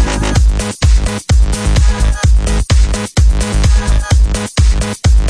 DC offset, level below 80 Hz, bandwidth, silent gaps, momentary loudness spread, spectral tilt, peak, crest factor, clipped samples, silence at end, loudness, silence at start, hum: under 0.1%; -12 dBFS; 11 kHz; none; 2 LU; -5 dB/octave; 0 dBFS; 10 dB; under 0.1%; 0 s; -13 LUFS; 0 s; none